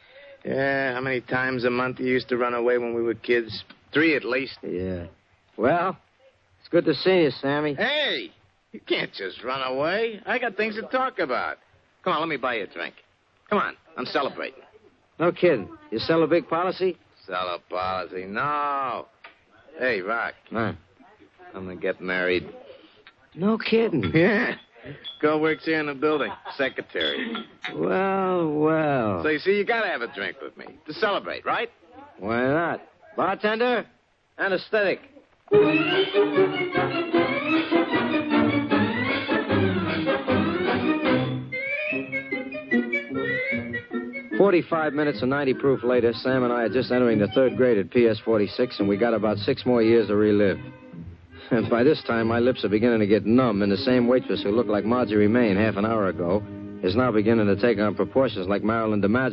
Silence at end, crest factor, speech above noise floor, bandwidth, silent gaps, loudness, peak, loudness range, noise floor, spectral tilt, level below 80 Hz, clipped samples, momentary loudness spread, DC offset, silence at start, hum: 0 s; 18 dB; 36 dB; 6 kHz; none; -24 LUFS; -6 dBFS; 6 LU; -60 dBFS; -8.5 dB/octave; -58 dBFS; under 0.1%; 11 LU; under 0.1%; 0.15 s; none